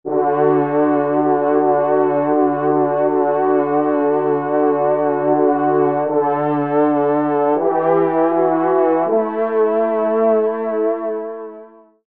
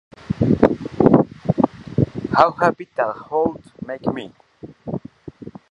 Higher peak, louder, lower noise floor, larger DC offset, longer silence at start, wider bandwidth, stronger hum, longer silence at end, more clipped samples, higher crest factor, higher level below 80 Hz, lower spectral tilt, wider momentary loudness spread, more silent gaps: second, -4 dBFS vs 0 dBFS; first, -16 LUFS vs -20 LUFS; about the same, -41 dBFS vs -38 dBFS; first, 0.3% vs under 0.1%; second, 0.05 s vs 0.3 s; second, 3.8 kHz vs 10.5 kHz; neither; first, 0.4 s vs 0.2 s; neither; second, 12 dB vs 20 dB; second, -72 dBFS vs -44 dBFS; first, -12 dB/octave vs -9 dB/octave; second, 3 LU vs 21 LU; neither